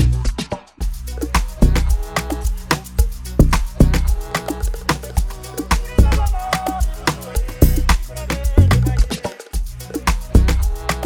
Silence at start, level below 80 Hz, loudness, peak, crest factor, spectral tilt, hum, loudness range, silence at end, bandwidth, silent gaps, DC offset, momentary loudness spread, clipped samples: 0 s; -18 dBFS; -20 LUFS; 0 dBFS; 16 dB; -5.5 dB/octave; none; 2 LU; 0 s; 19 kHz; none; under 0.1%; 11 LU; under 0.1%